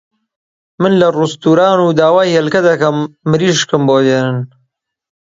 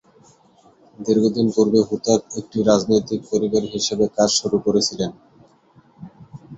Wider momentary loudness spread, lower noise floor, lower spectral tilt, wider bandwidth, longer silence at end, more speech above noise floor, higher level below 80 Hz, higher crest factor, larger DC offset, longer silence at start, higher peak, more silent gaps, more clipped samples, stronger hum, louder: about the same, 7 LU vs 9 LU; first, -65 dBFS vs -54 dBFS; about the same, -5.5 dB/octave vs -4.5 dB/octave; about the same, 7.8 kHz vs 8.4 kHz; first, 0.95 s vs 0 s; first, 54 dB vs 35 dB; about the same, -56 dBFS vs -56 dBFS; second, 12 dB vs 20 dB; neither; second, 0.8 s vs 1 s; about the same, 0 dBFS vs -2 dBFS; neither; neither; neither; first, -12 LUFS vs -19 LUFS